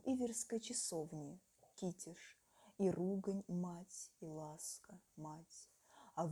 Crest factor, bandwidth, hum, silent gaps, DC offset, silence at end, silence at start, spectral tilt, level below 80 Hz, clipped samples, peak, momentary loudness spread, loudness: 18 dB; 19 kHz; none; none; under 0.1%; 0 s; 0.05 s; -5 dB/octave; -80 dBFS; under 0.1%; -28 dBFS; 21 LU; -45 LUFS